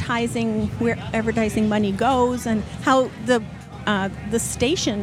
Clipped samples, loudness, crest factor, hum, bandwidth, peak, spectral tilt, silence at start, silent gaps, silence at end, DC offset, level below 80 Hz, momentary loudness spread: under 0.1%; -22 LUFS; 16 dB; none; 15.5 kHz; -6 dBFS; -5 dB/octave; 0 s; none; 0 s; under 0.1%; -44 dBFS; 5 LU